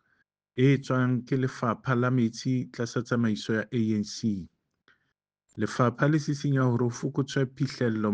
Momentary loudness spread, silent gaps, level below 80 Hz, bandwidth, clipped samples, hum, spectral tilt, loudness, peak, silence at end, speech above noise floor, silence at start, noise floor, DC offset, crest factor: 7 LU; none; -66 dBFS; 9 kHz; under 0.1%; none; -7 dB/octave; -28 LUFS; -8 dBFS; 0 s; 53 dB; 0.55 s; -79 dBFS; under 0.1%; 18 dB